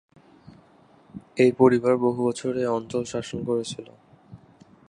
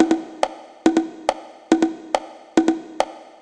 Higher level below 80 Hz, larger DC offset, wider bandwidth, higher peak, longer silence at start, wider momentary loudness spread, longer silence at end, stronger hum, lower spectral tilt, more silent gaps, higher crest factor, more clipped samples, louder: about the same, -62 dBFS vs -60 dBFS; neither; about the same, 11 kHz vs 10 kHz; about the same, -4 dBFS vs -2 dBFS; first, 1.15 s vs 0 s; first, 19 LU vs 6 LU; first, 0.55 s vs 0.2 s; neither; first, -6 dB/octave vs -4 dB/octave; neither; about the same, 22 dB vs 20 dB; neither; about the same, -23 LUFS vs -22 LUFS